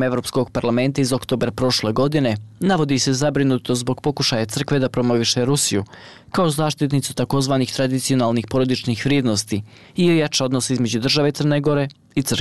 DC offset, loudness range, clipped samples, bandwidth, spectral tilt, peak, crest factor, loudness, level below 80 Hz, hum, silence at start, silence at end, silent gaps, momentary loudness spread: 0.4%; 1 LU; under 0.1%; 12.5 kHz; -5 dB/octave; -8 dBFS; 12 dB; -19 LUFS; -48 dBFS; none; 0 s; 0 s; none; 5 LU